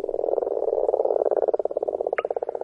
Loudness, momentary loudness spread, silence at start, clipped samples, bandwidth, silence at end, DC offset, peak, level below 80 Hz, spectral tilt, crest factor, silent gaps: -25 LUFS; 4 LU; 0 s; under 0.1%; 3.2 kHz; 0 s; under 0.1%; -6 dBFS; -60 dBFS; -7 dB/octave; 18 dB; none